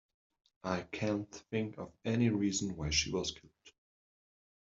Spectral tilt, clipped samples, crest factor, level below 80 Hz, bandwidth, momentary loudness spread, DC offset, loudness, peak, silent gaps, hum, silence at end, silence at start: -4.5 dB/octave; under 0.1%; 20 dB; -58 dBFS; 8 kHz; 11 LU; under 0.1%; -35 LUFS; -16 dBFS; none; none; 0.95 s; 0.65 s